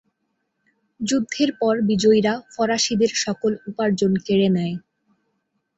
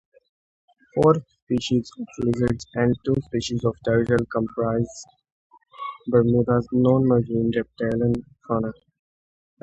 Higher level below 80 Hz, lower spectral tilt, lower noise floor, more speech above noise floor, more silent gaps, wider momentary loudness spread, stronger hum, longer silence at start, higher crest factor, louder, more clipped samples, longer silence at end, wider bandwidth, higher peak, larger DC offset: second, -60 dBFS vs -48 dBFS; second, -4.5 dB/octave vs -7.5 dB/octave; second, -74 dBFS vs under -90 dBFS; second, 54 dB vs over 68 dB; second, none vs 1.42-1.47 s, 5.32-5.50 s; second, 7 LU vs 11 LU; neither; about the same, 1 s vs 0.95 s; about the same, 16 dB vs 20 dB; about the same, -21 LUFS vs -23 LUFS; neither; about the same, 1 s vs 0.9 s; about the same, 8.2 kHz vs 8.8 kHz; second, -6 dBFS vs -2 dBFS; neither